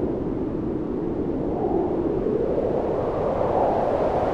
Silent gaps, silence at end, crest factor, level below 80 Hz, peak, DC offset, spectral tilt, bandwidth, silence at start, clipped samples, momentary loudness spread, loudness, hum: none; 0 s; 14 dB; -40 dBFS; -10 dBFS; under 0.1%; -9.5 dB/octave; 7.8 kHz; 0 s; under 0.1%; 5 LU; -24 LUFS; none